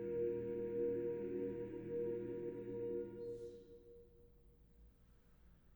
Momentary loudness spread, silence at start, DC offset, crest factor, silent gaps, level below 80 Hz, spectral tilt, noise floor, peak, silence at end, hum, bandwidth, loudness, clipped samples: 19 LU; 0 s; under 0.1%; 14 dB; none; -68 dBFS; -9.5 dB/octave; -67 dBFS; -30 dBFS; 0 s; none; over 20 kHz; -44 LUFS; under 0.1%